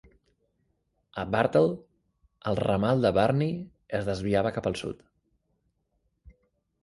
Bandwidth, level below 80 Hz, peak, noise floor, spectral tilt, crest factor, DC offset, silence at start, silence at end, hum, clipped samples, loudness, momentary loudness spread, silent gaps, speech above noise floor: 11.5 kHz; -54 dBFS; -8 dBFS; -75 dBFS; -7 dB/octave; 20 dB; under 0.1%; 1.15 s; 1.9 s; none; under 0.1%; -27 LUFS; 15 LU; none; 49 dB